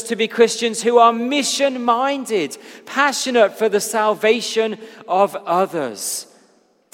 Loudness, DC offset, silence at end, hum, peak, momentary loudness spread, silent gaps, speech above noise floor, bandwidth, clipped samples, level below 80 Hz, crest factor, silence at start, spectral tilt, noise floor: -18 LUFS; under 0.1%; 0.7 s; none; 0 dBFS; 10 LU; none; 39 dB; 16.5 kHz; under 0.1%; -78 dBFS; 18 dB; 0 s; -2.5 dB/octave; -57 dBFS